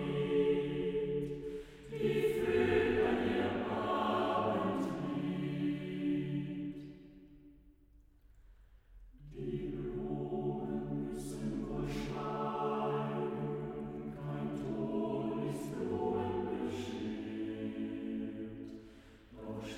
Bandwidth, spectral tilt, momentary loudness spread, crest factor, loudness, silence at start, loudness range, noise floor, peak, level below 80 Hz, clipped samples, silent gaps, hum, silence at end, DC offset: 16 kHz; -7 dB/octave; 13 LU; 18 dB; -37 LUFS; 0 s; 10 LU; -63 dBFS; -18 dBFS; -58 dBFS; under 0.1%; none; none; 0 s; under 0.1%